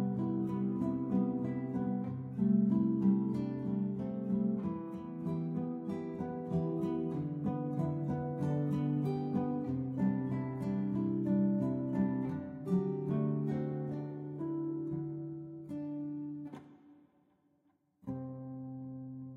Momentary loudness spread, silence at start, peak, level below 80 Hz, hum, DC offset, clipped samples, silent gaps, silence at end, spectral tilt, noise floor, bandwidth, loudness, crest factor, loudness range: 12 LU; 0 s; -18 dBFS; -66 dBFS; none; under 0.1%; under 0.1%; none; 0 s; -11 dB/octave; -74 dBFS; 4.9 kHz; -35 LUFS; 16 dB; 10 LU